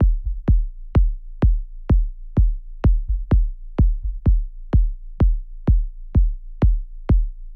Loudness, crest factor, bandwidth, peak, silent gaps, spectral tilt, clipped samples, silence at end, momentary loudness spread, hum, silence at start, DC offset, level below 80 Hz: -23 LUFS; 14 dB; 3.2 kHz; -6 dBFS; none; -11 dB/octave; under 0.1%; 0 s; 4 LU; none; 0 s; under 0.1%; -20 dBFS